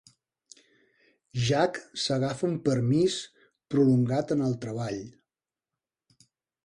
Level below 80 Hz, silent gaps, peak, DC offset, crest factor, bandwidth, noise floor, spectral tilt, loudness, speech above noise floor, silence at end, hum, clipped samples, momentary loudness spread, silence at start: -62 dBFS; none; -12 dBFS; under 0.1%; 18 dB; 11 kHz; under -90 dBFS; -6 dB/octave; -27 LUFS; over 64 dB; 1.55 s; none; under 0.1%; 12 LU; 1.35 s